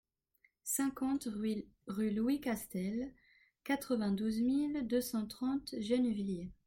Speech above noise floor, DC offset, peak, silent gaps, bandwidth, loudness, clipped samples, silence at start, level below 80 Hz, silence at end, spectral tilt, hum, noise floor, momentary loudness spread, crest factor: 39 dB; under 0.1%; -20 dBFS; none; 17 kHz; -36 LUFS; under 0.1%; 0.65 s; -66 dBFS; 0.15 s; -5 dB/octave; none; -75 dBFS; 8 LU; 16 dB